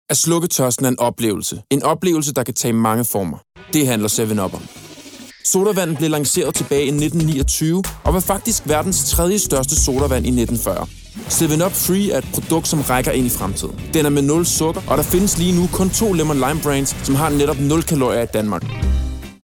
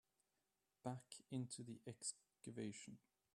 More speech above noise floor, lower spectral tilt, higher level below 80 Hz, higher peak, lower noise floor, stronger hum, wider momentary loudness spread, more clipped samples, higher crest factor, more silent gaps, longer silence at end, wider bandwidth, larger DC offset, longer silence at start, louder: second, 21 dB vs 38 dB; about the same, -4.5 dB/octave vs -4.5 dB/octave; first, -30 dBFS vs -90 dBFS; first, -4 dBFS vs -32 dBFS; second, -38 dBFS vs -90 dBFS; neither; about the same, 7 LU vs 9 LU; neither; second, 14 dB vs 22 dB; neither; second, 0.1 s vs 0.35 s; first, over 20 kHz vs 13 kHz; neither; second, 0.1 s vs 0.85 s; first, -17 LUFS vs -53 LUFS